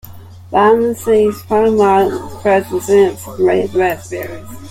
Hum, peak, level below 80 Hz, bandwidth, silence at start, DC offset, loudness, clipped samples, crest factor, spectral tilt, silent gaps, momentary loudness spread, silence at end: none; -2 dBFS; -48 dBFS; 16.5 kHz; 0.05 s; under 0.1%; -14 LUFS; under 0.1%; 12 dB; -6 dB/octave; none; 11 LU; 0 s